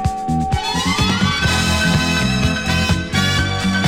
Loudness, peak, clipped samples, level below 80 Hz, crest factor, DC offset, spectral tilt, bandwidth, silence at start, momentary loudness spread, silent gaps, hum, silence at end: -17 LUFS; -2 dBFS; under 0.1%; -28 dBFS; 14 dB; under 0.1%; -4 dB/octave; 17 kHz; 0 s; 4 LU; none; none; 0 s